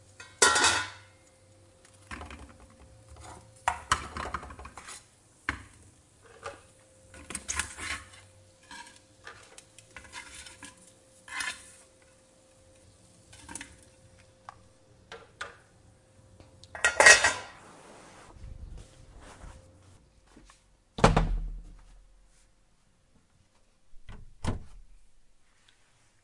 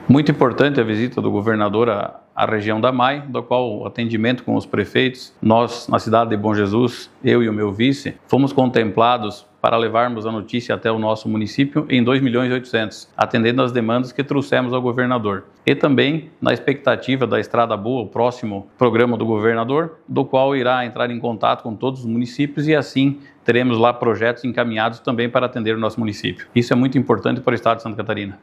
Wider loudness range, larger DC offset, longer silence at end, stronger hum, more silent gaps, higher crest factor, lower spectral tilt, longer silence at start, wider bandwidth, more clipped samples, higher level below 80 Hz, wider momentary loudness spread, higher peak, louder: first, 23 LU vs 2 LU; neither; first, 1.45 s vs 0.05 s; neither; neither; first, 32 dB vs 18 dB; second, -2 dB/octave vs -7 dB/octave; first, 0.2 s vs 0 s; about the same, 11.5 kHz vs 11.5 kHz; neither; first, -46 dBFS vs -62 dBFS; first, 28 LU vs 7 LU; about the same, -2 dBFS vs 0 dBFS; second, -26 LUFS vs -19 LUFS